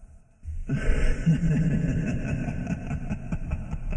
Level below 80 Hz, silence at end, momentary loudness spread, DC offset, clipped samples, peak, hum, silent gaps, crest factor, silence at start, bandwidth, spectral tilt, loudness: -30 dBFS; 0 s; 10 LU; under 0.1%; under 0.1%; -10 dBFS; none; none; 16 dB; 0 s; 9.4 kHz; -8 dB/octave; -28 LUFS